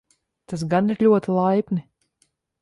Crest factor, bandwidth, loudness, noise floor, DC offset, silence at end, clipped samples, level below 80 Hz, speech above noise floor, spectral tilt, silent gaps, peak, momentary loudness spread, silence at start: 16 dB; 11.5 kHz; -21 LUFS; -68 dBFS; under 0.1%; 0.8 s; under 0.1%; -62 dBFS; 48 dB; -8 dB/octave; none; -6 dBFS; 12 LU; 0.5 s